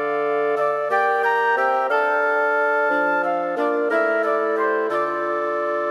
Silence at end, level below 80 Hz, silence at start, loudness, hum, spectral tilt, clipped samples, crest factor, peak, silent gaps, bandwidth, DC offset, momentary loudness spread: 0 s; -74 dBFS; 0 s; -20 LUFS; none; -5 dB/octave; under 0.1%; 12 dB; -8 dBFS; none; 12.5 kHz; under 0.1%; 4 LU